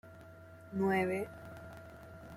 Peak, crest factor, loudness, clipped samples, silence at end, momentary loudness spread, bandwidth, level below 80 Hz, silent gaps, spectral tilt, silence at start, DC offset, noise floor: -20 dBFS; 18 dB; -35 LUFS; under 0.1%; 0 s; 23 LU; 15.5 kHz; -66 dBFS; none; -7 dB/octave; 0.05 s; under 0.1%; -54 dBFS